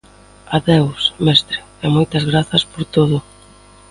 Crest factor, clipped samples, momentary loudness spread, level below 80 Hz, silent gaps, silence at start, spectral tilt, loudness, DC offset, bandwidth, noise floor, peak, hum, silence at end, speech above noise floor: 16 dB; under 0.1%; 8 LU; -44 dBFS; none; 0.5 s; -6 dB/octave; -16 LUFS; under 0.1%; 11.5 kHz; -44 dBFS; 0 dBFS; none; 0.7 s; 29 dB